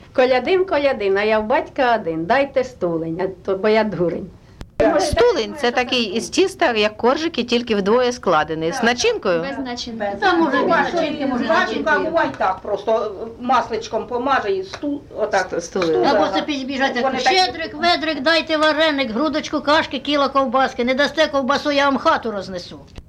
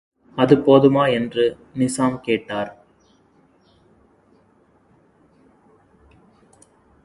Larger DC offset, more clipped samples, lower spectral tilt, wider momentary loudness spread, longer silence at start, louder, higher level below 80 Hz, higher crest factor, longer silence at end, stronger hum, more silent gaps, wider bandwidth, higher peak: neither; neither; second, -4 dB/octave vs -6 dB/octave; second, 8 LU vs 15 LU; second, 0 s vs 0.35 s; about the same, -19 LUFS vs -18 LUFS; first, -46 dBFS vs -58 dBFS; second, 14 dB vs 22 dB; second, 0.05 s vs 4.35 s; neither; neither; first, 13 kHz vs 11.5 kHz; second, -4 dBFS vs 0 dBFS